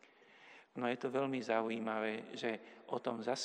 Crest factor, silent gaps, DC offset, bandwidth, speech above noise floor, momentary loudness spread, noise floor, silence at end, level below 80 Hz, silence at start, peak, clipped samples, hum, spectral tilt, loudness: 20 dB; none; under 0.1%; 10.5 kHz; 24 dB; 12 LU; -63 dBFS; 0 s; under -90 dBFS; 0.35 s; -20 dBFS; under 0.1%; none; -4.5 dB/octave; -39 LUFS